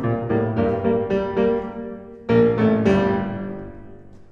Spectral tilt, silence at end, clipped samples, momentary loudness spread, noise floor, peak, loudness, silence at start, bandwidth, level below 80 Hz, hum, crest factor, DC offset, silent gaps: -9 dB/octave; 0.05 s; under 0.1%; 16 LU; -41 dBFS; -4 dBFS; -20 LUFS; 0 s; 7 kHz; -46 dBFS; none; 16 dB; under 0.1%; none